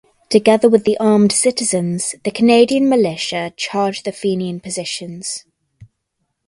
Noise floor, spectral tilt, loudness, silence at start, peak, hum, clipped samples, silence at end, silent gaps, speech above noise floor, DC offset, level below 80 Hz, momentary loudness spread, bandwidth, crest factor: -72 dBFS; -4 dB/octave; -16 LUFS; 0.3 s; 0 dBFS; none; under 0.1%; 0.65 s; none; 57 dB; under 0.1%; -58 dBFS; 12 LU; 11.5 kHz; 16 dB